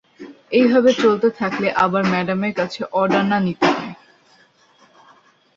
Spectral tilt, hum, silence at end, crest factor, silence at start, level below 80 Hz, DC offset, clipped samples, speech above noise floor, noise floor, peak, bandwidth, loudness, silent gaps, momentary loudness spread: -6 dB/octave; none; 1.65 s; 18 dB; 0.2 s; -60 dBFS; under 0.1%; under 0.1%; 37 dB; -54 dBFS; -2 dBFS; 7.6 kHz; -18 LUFS; none; 8 LU